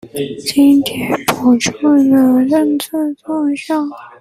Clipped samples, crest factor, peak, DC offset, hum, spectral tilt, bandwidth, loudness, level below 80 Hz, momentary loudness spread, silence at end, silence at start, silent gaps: under 0.1%; 14 dB; 0 dBFS; under 0.1%; none; -4.5 dB/octave; 16 kHz; -14 LUFS; -54 dBFS; 9 LU; 0.15 s; 0.05 s; none